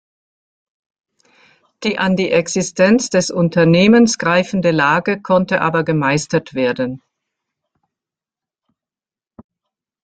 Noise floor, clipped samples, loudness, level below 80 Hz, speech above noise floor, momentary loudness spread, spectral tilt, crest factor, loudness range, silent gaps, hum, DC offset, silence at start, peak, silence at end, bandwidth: under -90 dBFS; under 0.1%; -15 LUFS; -56 dBFS; over 75 dB; 9 LU; -5 dB/octave; 16 dB; 10 LU; none; none; under 0.1%; 1.8 s; 0 dBFS; 3.05 s; 9.2 kHz